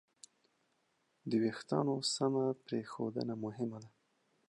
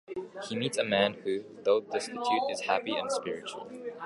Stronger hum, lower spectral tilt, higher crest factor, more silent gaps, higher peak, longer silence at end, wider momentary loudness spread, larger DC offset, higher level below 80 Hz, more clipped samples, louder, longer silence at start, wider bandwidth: neither; first, -5 dB/octave vs -3.5 dB/octave; about the same, 18 dB vs 22 dB; neither; second, -20 dBFS vs -10 dBFS; first, 0.6 s vs 0 s; second, 9 LU vs 12 LU; neither; second, -82 dBFS vs -74 dBFS; neither; second, -37 LUFS vs -31 LUFS; first, 1.25 s vs 0.1 s; about the same, 11 kHz vs 11.5 kHz